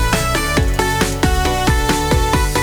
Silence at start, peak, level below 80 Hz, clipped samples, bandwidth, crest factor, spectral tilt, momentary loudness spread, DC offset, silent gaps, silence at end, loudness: 0 s; 0 dBFS; -20 dBFS; under 0.1%; over 20 kHz; 14 dB; -4 dB/octave; 1 LU; under 0.1%; none; 0 s; -16 LUFS